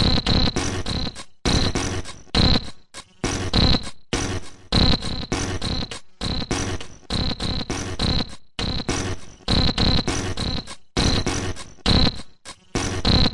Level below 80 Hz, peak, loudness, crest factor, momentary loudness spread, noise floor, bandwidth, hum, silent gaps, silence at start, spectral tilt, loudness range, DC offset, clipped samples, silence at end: -30 dBFS; -6 dBFS; -23 LUFS; 16 dB; 13 LU; -42 dBFS; 11.5 kHz; none; none; 0 s; -4 dB/octave; 4 LU; under 0.1%; under 0.1%; 0 s